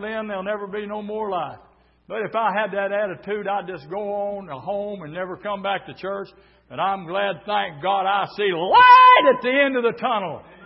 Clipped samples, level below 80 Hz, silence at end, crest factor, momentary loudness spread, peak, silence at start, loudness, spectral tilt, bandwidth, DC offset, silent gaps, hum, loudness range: under 0.1%; -62 dBFS; 0.25 s; 18 dB; 18 LU; -2 dBFS; 0 s; -20 LUFS; -8.5 dB/octave; 5.8 kHz; under 0.1%; none; none; 12 LU